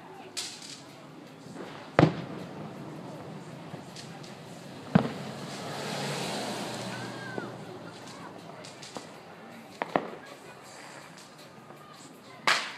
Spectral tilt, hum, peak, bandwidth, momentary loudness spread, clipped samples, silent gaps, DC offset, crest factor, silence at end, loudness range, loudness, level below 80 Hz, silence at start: -5 dB/octave; none; 0 dBFS; 15.5 kHz; 20 LU; under 0.1%; none; under 0.1%; 34 dB; 0 s; 7 LU; -34 LUFS; -64 dBFS; 0 s